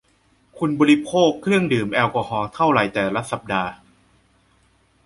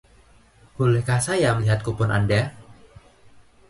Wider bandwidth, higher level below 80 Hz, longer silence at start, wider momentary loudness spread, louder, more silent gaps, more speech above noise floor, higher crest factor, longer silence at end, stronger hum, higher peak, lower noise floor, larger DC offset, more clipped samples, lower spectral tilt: about the same, 11.5 kHz vs 11.5 kHz; second, -54 dBFS vs -46 dBFS; second, 0.55 s vs 0.8 s; first, 9 LU vs 3 LU; about the same, -20 LUFS vs -22 LUFS; neither; first, 41 dB vs 33 dB; about the same, 18 dB vs 16 dB; first, 1.3 s vs 0.95 s; neither; first, -2 dBFS vs -8 dBFS; first, -60 dBFS vs -54 dBFS; neither; neither; about the same, -6 dB/octave vs -6 dB/octave